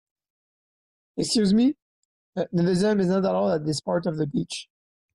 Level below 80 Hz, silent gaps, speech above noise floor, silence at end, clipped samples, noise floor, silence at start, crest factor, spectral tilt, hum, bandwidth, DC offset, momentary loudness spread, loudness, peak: -60 dBFS; 1.82-2.33 s; over 67 dB; 0.5 s; under 0.1%; under -90 dBFS; 1.15 s; 14 dB; -6 dB/octave; none; 12 kHz; under 0.1%; 14 LU; -24 LUFS; -12 dBFS